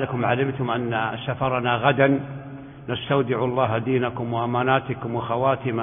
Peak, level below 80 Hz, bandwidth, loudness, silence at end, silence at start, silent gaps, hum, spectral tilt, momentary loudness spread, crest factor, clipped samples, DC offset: -2 dBFS; -54 dBFS; 3.7 kHz; -23 LUFS; 0 s; 0 s; none; none; -11.5 dB/octave; 9 LU; 20 dB; under 0.1%; under 0.1%